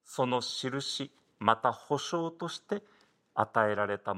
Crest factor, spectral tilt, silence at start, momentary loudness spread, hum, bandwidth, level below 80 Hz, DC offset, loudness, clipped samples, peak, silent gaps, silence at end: 24 dB; -4 dB/octave; 0.1 s; 10 LU; none; 16 kHz; -80 dBFS; under 0.1%; -32 LUFS; under 0.1%; -8 dBFS; none; 0 s